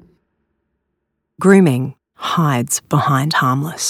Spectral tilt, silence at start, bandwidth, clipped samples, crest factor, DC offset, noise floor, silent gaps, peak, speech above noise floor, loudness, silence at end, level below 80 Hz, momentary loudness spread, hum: -5 dB/octave; 1.4 s; 16 kHz; under 0.1%; 18 dB; under 0.1%; -73 dBFS; none; 0 dBFS; 59 dB; -15 LUFS; 0 s; -62 dBFS; 10 LU; none